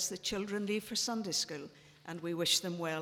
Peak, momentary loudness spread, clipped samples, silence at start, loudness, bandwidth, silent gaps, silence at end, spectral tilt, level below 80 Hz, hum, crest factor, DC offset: -16 dBFS; 16 LU; under 0.1%; 0 s; -34 LUFS; 17.5 kHz; none; 0 s; -2.5 dB/octave; -70 dBFS; none; 20 dB; under 0.1%